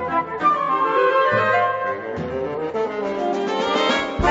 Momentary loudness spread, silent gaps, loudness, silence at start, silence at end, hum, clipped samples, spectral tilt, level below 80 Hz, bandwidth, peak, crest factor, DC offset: 8 LU; none; -20 LUFS; 0 s; 0 s; none; under 0.1%; -5 dB/octave; -42 dBFS; 8 kHz; -6 dBFS; 14 dB; under 0.1%